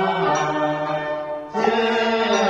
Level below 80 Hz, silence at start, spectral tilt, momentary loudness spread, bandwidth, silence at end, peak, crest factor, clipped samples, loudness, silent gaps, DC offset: -58 dBFS; 0 s; -4.5 dB/octave; 7 LU; 8.2 kHz; 0 s; -6 dBFS; 14 dB; under 0.1%; -21 LUFS; none; under 0.1%